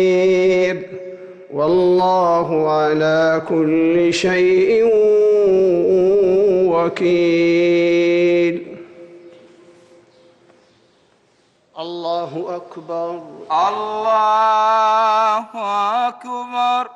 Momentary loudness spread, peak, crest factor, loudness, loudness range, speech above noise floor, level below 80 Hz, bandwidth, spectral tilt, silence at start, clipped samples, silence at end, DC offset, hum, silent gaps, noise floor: 14 LU; -8 dBFS; 8 dB; -16 LUFS; 14 LU; 42 dB; -58 dBFS; 8.6 kHz; -6 dB/octave; 0 s; under 0.1%; 0.05 s; under 0.1%; none; none; -58 dBFS